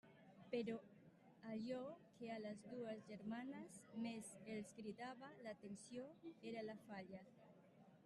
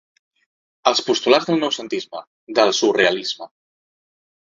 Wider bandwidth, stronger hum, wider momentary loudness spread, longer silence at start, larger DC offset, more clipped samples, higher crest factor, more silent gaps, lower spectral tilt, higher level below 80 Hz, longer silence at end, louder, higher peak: first, 12 kHz vs 7.8 kHz; neither; first, 18 LU vs 15 LU; second, 0.05 s vs 0.85 s; neither; neither; about the same, 18 dB vs 22 dB; second, none vs 2.27-2.47 s; first, -5.5 dB/octave vs -3 dB/octave; second, -90 dBFS vs -64 dBFS; second, 0 s vs 1.05 s; second, -53 LUFS vs -19 LUFS; second, -36 dBFS vs 0 dBFS